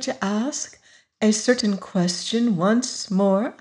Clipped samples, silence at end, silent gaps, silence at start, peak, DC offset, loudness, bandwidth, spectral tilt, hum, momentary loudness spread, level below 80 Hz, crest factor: under 0.1%; 0.05 s; none; 0 s; -6 dBFS; under 0.1%; -22 LUFS; 11 kHz; -4.5 dB/octave; none; 5 LU; -68 dBFS; 16 dB